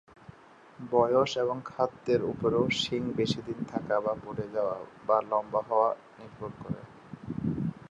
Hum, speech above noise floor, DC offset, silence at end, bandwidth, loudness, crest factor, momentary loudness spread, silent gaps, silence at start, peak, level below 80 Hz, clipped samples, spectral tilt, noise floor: none; 25 dB; under 0.1%; 0.05 s; 10.5 kHz; -30 LUFS; 22 dB; 14 LU; none; 0.3 s; -10 dBFS; -60 dBFS; under 0.1%; -6 dB/octave; -54 dBFS